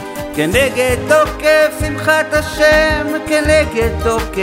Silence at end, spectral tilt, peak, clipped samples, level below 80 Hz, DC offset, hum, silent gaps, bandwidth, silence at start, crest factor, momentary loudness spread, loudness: 0 s; -4.5 dB/octave; 0 dBFS; under 0.1%; -28 dBFS; under 0.1%; none; none; 16.5 kHz; 0 s; 14 dB; 6 LU; -13 LUFS